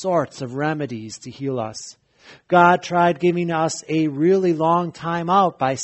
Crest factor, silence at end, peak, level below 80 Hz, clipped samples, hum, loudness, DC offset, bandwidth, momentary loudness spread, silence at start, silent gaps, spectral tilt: 20 dB; 0 s; 0 dBFS; -62 dBFS; under 0.1%; none; -20 LUFS; under 0.1%; 8.4 kHz; 14 LU; 0 s; none; -6 dB/octave